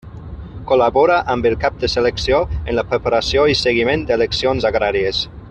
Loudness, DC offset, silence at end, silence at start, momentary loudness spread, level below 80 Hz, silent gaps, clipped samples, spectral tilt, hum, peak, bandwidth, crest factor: -16 LUFS; under 0.1%; 0 s; 0.05 s; 7 LU; -34 dBFS; none; under 0.1%; -5 dB/octave; none; -2 dBFS; 9 kHz; 14 dB